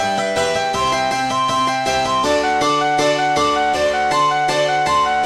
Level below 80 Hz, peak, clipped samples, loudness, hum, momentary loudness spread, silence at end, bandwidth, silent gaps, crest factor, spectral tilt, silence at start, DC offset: -46 dBFS; -6 dBFS; under 0.1%; -17 LUFS; none; 2 LU; 0 s; 14.5 kHz; none; 12 dB; -3 dB/octave; 0 s; under 0.1%